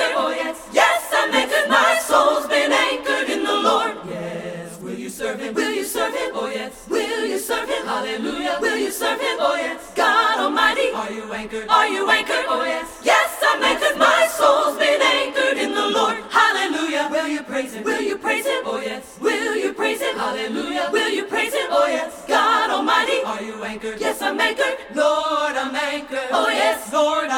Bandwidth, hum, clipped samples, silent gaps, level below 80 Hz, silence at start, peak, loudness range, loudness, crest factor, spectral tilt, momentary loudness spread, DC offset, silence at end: 19 kHz; none; under 0.1%; none; -56 dBFS; 0 s; -2 dBFS; 6 LU; -19 LUFS; 18 dB; -2 dB/octave; 10 LU; under 0.1%; 0 s